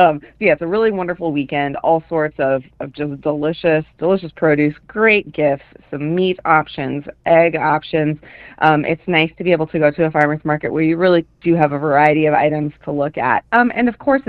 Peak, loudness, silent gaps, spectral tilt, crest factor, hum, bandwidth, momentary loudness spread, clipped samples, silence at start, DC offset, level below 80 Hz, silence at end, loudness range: 0 dBFS; -17 LUFS; none; -9 dB/octave; 16 dB; none; 5.2 kHz; 9 LU; under 0.1%; 0 s; under 0.1%; -50 dBFS; 0.05 s; 3 LU